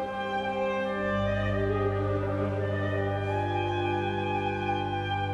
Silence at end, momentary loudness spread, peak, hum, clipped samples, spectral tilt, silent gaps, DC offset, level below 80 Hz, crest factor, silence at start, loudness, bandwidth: 0 s; 2 LU; -16 dBFS; 50 Hz at -45 dBFS; under 0.1%; -7.5 dB/octave; none; under 0.1%; -48 dBFS; 14 dB; 0 s; -29 LUFS; 7.6 kHz